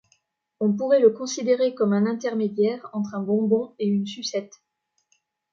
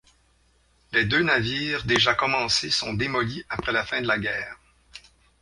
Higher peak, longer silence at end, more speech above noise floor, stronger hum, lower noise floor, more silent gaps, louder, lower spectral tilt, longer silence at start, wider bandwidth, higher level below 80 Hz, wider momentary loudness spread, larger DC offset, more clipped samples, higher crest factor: about the same, -6 dBFS vs -4 dBFS; first, 1.05 s vs 0.45 s; first, 47 dB vs 38 dB; neither; first, -70 dBFS vs -63 dBFS; neither; about the same, -23 LUFS vs -23 LUFS; first, -6 dB/octave vs -3.5 dB/octave; second, 0.6 s vs 0.9 s; second, 7.6 kHz vs 11.5 kHz; second, -74 dBFS vs -50 dBFS; first, 11 LU vs 8 LU; neither; neither; about the same, 18 dB vs 22 dB